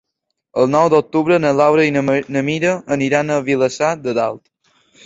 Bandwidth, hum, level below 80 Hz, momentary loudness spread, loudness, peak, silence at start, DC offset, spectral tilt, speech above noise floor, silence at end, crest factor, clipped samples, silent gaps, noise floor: 8 kHz; none; -58 dBFS; 7 LU; -16 LUFS; 0 dBFS; 0.55 s; under 0.1%; -6 dB/octave; 60 dB; 0.7 s; 16 dB; under 0.1%; none; -76 dBFS